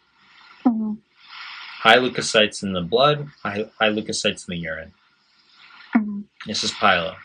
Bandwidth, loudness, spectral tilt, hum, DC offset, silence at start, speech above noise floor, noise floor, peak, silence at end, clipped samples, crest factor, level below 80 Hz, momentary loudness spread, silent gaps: 11 kHz; -21 LUFS; -3.5 dB/octave; none; under 0.1%; 0.65 s; 38 dB; -59 dBFS; 0 dBFS; 0 s; under 0.1%; 22 dB; -62 dBFS; 18 LU; none